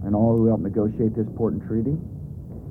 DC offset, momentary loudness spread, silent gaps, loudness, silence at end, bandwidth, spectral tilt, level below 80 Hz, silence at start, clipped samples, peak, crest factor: under 0.1%; 17 LU; none; -23 LUFS; 0 s; 2.1 kHz; -13 dB/octave; -44 dBFS; 0 s; under 0.1%; -10 dBFS; 12 dB